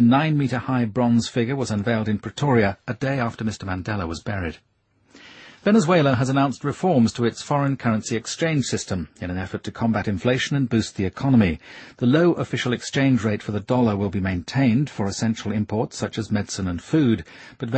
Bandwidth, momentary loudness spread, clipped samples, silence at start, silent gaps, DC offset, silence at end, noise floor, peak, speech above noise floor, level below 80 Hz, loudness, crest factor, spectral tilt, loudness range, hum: 8.8 kHz; 9 LU; under 0.1%; 0 s; none; under 0.1%; 0 s; -53 dBFS; -4 dBFS; 32 dB; -50 dBFS; -22 LUFS; 18 dB; -6 dB/octave; 3 LU; none